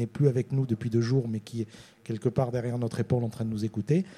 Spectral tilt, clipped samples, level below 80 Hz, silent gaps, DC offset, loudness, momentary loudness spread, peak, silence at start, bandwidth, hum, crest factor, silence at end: -8.5 dB/octave; under 0.1%; -60 dBFS; none; under 0.1%; -29 LUFS; 11 LU; -10 dBFS; 0 s; 12 kHz; none; 18 dB; 0.05 s